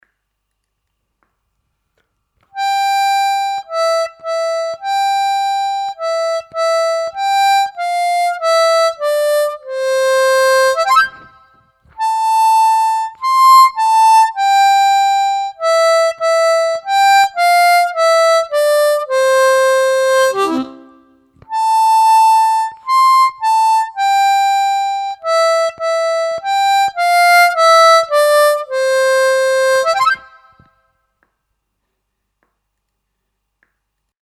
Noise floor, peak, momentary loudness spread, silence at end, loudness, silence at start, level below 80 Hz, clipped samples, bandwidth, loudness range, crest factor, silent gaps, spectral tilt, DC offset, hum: -72 dBFS; 0 dBFS; 9 LU; 4.05 s; -13 LUFS; 2.55 s; -66 dBFS; under 0.1%; 17 kHz; 7 LU; 14 dB; none; 0 dB/octave; under 0.1%; none